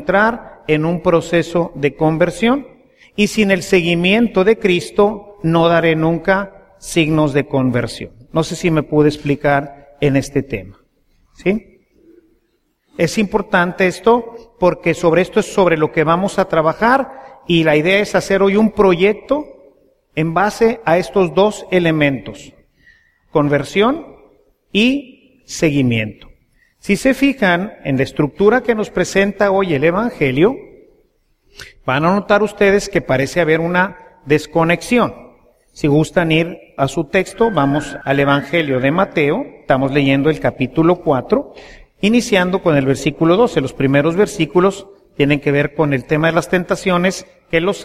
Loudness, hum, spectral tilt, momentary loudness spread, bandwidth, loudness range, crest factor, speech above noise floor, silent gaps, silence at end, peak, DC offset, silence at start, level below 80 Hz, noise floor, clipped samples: -15 LUFS; none; -6 dB/octave; 8 LU; 15 kHz; 4 LU; 16 dB; 49 dB; none; 0 s; 0 dBFS; under 0.1%; 0 s; -42 dBFS; -64 dBFS; under 0.1%